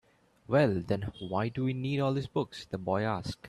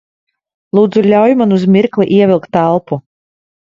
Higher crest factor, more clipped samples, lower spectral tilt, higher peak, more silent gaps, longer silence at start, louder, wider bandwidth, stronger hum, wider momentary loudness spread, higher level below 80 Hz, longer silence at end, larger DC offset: first, 18 dB vs 12 dB; neither; second, -7.5 dB/octave vs -9 dB/octave; second, -14 dBFS vs 0 dBFS; neither; second, 0.5 s vs 0.75 s; second, -31 LUFS vs -11 LUFS; first, 12 kHz vs 7.4 kHz; neither; about the same, 8 LU vs 7 LU; second, -60 dBFS vs -54 dBFS; second, 0 s vs 0.7 s; neither